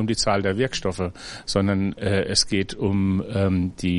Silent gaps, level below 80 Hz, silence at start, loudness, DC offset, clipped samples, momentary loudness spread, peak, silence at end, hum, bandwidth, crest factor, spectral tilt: none; -46 dBFS; 0 s; -23 LUFS; under 0.1%; under 0.1%; 7 LU; -4 dBFS; 0 s; none; 11.5 kHz; 18 dB; -5 dB/octave